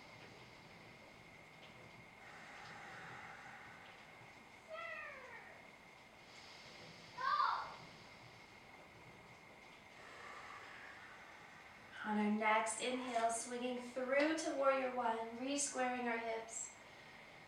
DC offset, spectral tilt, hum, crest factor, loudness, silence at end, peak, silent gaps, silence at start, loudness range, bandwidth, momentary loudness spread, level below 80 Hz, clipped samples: under 0.1%; -3 dB/octave; none; 22 dB; -41 LUFS; 0 s; -22 dBFS; none; 0 s; 17 LU; 16 kHz; 22 LU; -80 dBFS; under 0.1%